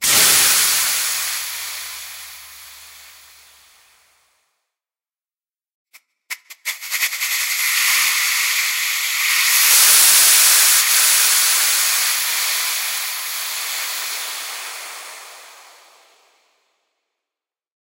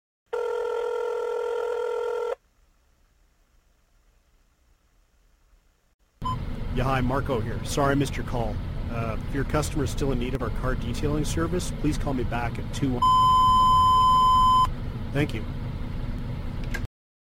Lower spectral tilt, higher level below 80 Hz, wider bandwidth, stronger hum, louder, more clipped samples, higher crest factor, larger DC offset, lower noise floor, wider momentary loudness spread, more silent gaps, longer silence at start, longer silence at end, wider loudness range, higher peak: second, 3.5 dB/octave vs -5.5 dB/octave; second, -66 dBFS vs -34 dBFS; about the same, 16.5 kHz vs 16.5 kHz; neither; first, -14 LUFS vs -25 LUFS; neither; about the same, 20 dB vs 16 dB; neither; first, under -90 dBFS vs -63 dBFS; first, 21 LU vs 16 LU; first, 5.74-5.85 s vs 5.94-5.99 s; second, 0 s vs 0.3 s; first, 2.35 s vs 0.5 s; first, 20 LU vs 14 LU; first, 0 dBFS vs -10 dBFS